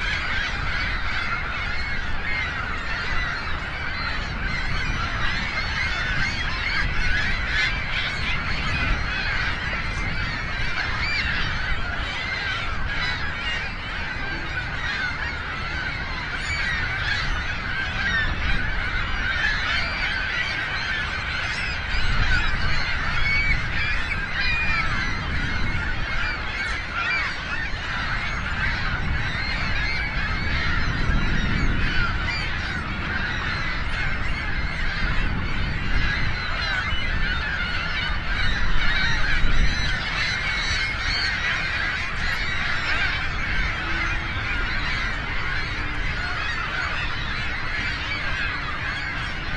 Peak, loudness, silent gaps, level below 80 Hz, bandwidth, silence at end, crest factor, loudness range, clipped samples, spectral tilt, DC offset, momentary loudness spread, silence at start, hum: -6 dBFS; -25 LUFS; none; -28 dBFS; 9.2 kHz; 0 s; 18 dB; 3 LU; under 0.1%; -4 dB/octave; under 0.1%; 5 LU; 0 s; none